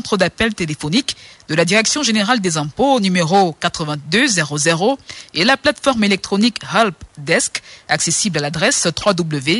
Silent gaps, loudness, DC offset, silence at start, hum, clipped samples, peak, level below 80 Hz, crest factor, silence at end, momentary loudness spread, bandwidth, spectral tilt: none; -16 LUFS; under 0.1%; 0.05 s; none; under 0.1%; -2 dBFS; -48 dBFS; 16 dB; 0 s; 7 LU; 11.5 kHz; -3.5 dB/octave